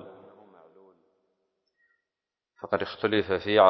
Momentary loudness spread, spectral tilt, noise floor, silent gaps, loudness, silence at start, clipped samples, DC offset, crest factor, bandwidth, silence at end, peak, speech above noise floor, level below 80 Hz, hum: 20 LU; -7.5 dB/octave; -89 dBFS; none; -28 LUFS; 0.05 s; under 0.1%; under 0.1%; 24 dB; 6 kHz; 0 s; -6 dBFS; 66 dB; -62 dBFS; none